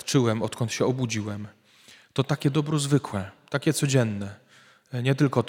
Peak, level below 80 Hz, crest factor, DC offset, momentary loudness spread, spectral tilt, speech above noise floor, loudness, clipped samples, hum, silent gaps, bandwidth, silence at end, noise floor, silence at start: -6 dBFS; -66 dBFS; 20 dB; under 0.1%; 12 LU; -5.5 dB/octave; 31 dB; -26 LUFS; under 0.1%; none; none; 16.5 kHz; 0 s; -56 dBFS; 0.05 s